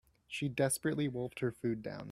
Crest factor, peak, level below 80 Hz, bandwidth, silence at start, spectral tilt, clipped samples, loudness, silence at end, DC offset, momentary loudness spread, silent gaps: 18 dB; -18 dBFS; -68 dBFS; 16 kHz; 0.3 s; -5 dB/octave; under 0.1%; -36 LUFS; 0 s; under 0.1%; 7 LU; none